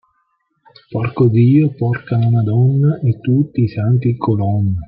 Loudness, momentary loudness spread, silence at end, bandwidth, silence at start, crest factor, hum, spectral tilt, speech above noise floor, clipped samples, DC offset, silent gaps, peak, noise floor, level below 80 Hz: -15 LUFS; 6 LU; 0 s; 4.9 kHz; 0.9 s; 12 dB; none; -12.5 dB/octave; 51 dB; under 0.1%; under 0.1%; none; -2 dBFS; -65 dBFS; -48 dBFS